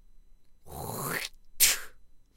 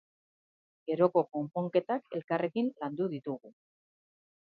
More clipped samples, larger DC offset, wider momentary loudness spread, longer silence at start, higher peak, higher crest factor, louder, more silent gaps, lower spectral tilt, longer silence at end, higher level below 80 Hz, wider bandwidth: neither; neither; first, 18 LU vs 12 LU; second, 0.15 s vs 0.85 s; first, -6 dBFS vs -12 dBFS; about the same, 26 dB vs 22 dB; first, -27 LUFS vs -32 LUFS; second, none vs 2.24-2.28 s; second, -0.5 dB/octave vs -10 dB/octave; second, 0.15 s vs 1 s; first, -52 dBFS vs -84 dBFS; first, 16.5 kHz vs 4.9 kHz